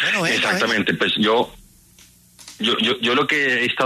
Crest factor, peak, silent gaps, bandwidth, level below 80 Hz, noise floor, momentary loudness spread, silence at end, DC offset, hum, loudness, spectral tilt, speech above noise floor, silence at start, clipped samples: 14 dB; -6 dBFS; none; 13.5 kHz; -58 dBFS; -50 dBFS; 4 LU; 0 s; under 0.1%; none; -18 LUFS; -3.5 dB/octave; 31 dB; 0 s; under 0.1%